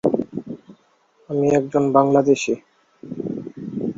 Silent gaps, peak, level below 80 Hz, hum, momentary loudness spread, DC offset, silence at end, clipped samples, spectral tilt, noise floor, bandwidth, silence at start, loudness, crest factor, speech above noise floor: none; -2 dBFS; -60 dBFS; none; 17 LU; under 0.1%; 0.05 s; under 0.1%; -6.5 dB/octave; -59 dBFS; 7.8 kHz; 0.05 s; -20 LUFS; 20 dB; 42 dB